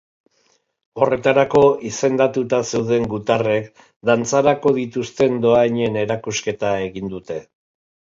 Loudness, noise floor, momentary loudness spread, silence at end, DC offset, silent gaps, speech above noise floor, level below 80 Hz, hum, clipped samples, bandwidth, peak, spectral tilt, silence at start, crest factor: -18 LUFS; -63 dBFS; 12 LU; 0.7 s; under 0.1%; 3.96-4.00 s; 45 dB; -54 dBFS; none; under 0.1%; 7.8 kHz; 0 dBFS; -5 dB/octave; 0.95 s; 18 dB